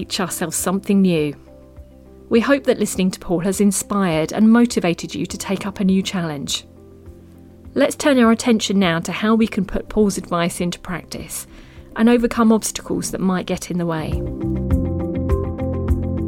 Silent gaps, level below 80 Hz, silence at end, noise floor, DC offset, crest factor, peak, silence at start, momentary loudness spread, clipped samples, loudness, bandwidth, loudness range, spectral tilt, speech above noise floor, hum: none; -34 dBFS; 0 s; -43 dBFS; under 0.1%; 16 dB; -4 dBFS; 0 s; 10 LU; under 0.1%; -19 LUFS; 17 kHz; 4 LU; -5 dB/octave; 24 dB; none